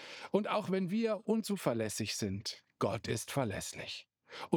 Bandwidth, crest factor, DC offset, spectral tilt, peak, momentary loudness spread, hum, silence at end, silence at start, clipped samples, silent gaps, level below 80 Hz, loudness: over 20 kHz; 22 dB; under 0.1%; -5 dB/octave; -14 dBFS; 10 LU; none; 0 s; 0 s; under 0.1%; none; -72 dBFS; -36 LUFS